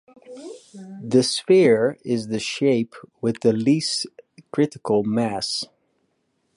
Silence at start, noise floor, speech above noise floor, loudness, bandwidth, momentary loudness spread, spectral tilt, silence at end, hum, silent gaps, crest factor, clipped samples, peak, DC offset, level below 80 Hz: 0.3 s; -70 dBFS; 49 dB; -21 LUFS; 11.5 kHz; 21 LU; -5 dB/octave; 0.9 s; none; none; 18 dB; under 0.1%; -4 dBFS; under 0.1%; -64 dBFS